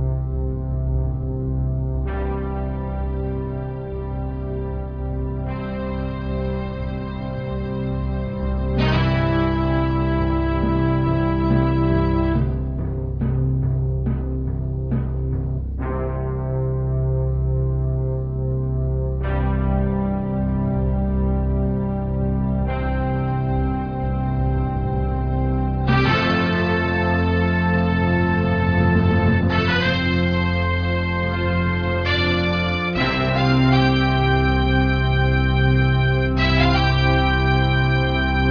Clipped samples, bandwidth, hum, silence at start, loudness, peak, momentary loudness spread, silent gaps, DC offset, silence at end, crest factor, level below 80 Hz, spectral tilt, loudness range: under 0.1%; 5.4 kHz; none; 0 s; -21 LUFS; -6 dBFS; 9 LU; none; under 0.1%; 0 s; 14 dB; -26 dBFS; -8.5 dB/octave; 8 LU